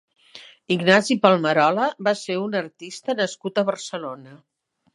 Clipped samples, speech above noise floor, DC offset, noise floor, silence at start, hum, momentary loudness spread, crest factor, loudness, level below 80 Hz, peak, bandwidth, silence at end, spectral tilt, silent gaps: under 0.1%; 25 dB; under 0.1%; -47 dBFS; 0.35 s; none; 15 LU; 22 dB; -21 LUFS; -72 dBFS; 0 dBFS; 11.5 kHz; 0.6 s; -4.5 dB/octave; none